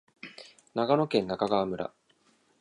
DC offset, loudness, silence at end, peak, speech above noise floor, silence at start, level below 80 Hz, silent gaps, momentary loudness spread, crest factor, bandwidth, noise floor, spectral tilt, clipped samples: under 0.1%; -29 LUFS; 0.75 s; -10 dBFS; 40 dB; 0.25 s; -66 dBFS; none; 20 LU; 20 dB; 11 kHz; -67 dBFS; -7 dB/octave; under 0.1%